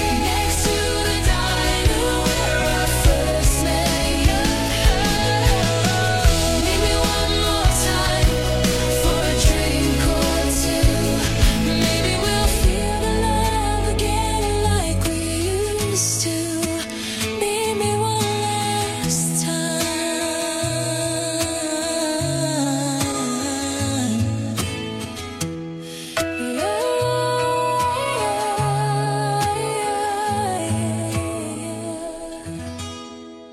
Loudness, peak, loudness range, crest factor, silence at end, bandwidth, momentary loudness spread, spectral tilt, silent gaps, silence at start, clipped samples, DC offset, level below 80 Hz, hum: -20 LUFS; -2 dBFS; 5 LU; 18 dB; 0 s; 16 kHz; 8 LU; -4 dB/octave; none; 0 s; under 0.1%; under 0.1%; -26 dBFS; none